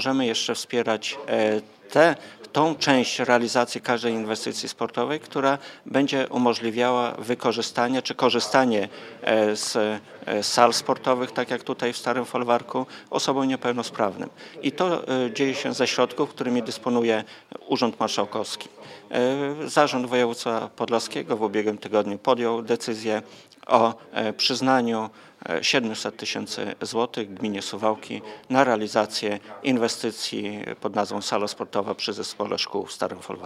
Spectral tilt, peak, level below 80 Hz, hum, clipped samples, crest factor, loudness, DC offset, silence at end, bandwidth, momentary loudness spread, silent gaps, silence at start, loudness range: -3.5 dB/octave; 0 dBFS; -78 dBFS; none; under 0.1%; 24 dB; -24 LUFS; under 0.1%; 0 s; 15 kHz; 9 LU; none; 0 s; 4 LU